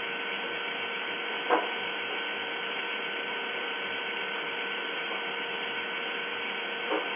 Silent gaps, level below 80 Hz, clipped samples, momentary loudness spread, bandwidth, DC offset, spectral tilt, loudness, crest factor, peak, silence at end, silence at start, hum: none; -88 dBFS; under 0.1%; 3 LU; 3.7 kHz; under 0.1%; 1 dB/octave; -31 LUFS; 22 dB; -12 dBFS; 0 s; 0 s; none